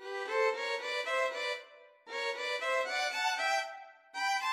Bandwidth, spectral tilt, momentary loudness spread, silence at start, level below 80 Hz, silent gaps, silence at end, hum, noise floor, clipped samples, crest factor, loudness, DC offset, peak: 16 kHz; 2.5 dB/octave; 11 LU; 0 s; under -90 dBFS; none; 0 s; none; -55 dBFS; under 0.1%; 16 dB; -33 LUFS; under 0.1%; -20 dBFS